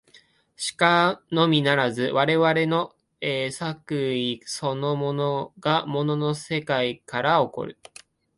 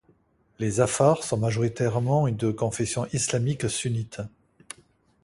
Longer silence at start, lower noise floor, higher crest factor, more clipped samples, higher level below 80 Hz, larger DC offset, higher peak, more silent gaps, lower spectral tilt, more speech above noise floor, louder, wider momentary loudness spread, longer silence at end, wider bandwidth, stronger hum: about the same, 0.6 s vs 0.6 s; second, -57 dBFS vs -63 dBFS; about the same, 20 dB vs 20 dB; neither; second, -64 dBFS vs -54 dBFS; neither; about the same, -4 dBFS vs -6 dBFS; neither; about the same, -5 dB/octave vs -5.5 dB/octave; second, 34 dB vs 39 dB; about the same, -24 LUFS vs -25 LUFS; second, 9 LU vs 18 LU; second, 0.65 s vs 0.95 s; about the same, 11.5 kHz vs 11.5 kHz; neither